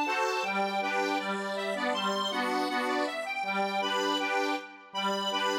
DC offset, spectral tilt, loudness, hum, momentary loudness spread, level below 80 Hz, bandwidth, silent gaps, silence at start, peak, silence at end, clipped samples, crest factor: under 0.1%; -3 dB/octave; -30 LUFS; none; 4 LU; under -90 dBFS; 16.5 kHz; none; 0 s; -16 dBFS; 0 s; under 0.1%; 14 dB